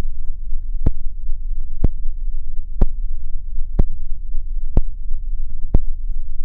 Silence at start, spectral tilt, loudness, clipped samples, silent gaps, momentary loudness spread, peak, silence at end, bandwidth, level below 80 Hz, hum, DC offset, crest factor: 0 s; -11.5 dB/octave; -28 LUFS; under 0.1%; none; 8 LU; 0 dBFS; 0 s; 1 kHz; -18 dBFS; none; under 0.1%; 14 dB